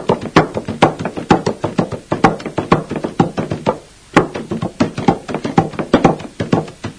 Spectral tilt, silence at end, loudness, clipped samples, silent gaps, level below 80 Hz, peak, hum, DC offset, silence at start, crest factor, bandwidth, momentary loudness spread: -6.5 dB/octave; 0 s; -17 LUFS; 0.2%; none; -42 dBFS; 0 dBFS; none; under 0.1%; 0 s; 16 dB; 10.5 kHz; 9 LU